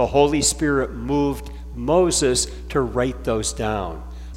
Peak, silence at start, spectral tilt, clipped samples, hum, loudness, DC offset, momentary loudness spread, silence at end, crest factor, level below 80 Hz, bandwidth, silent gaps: -2 dBFS; 0 s; -4 dB/octave; under 0.1%; none; -21 LUFS; under 0.1%; 12 LU; 0 s; 18 dB; -34 dBFS; 16.5 kHz; none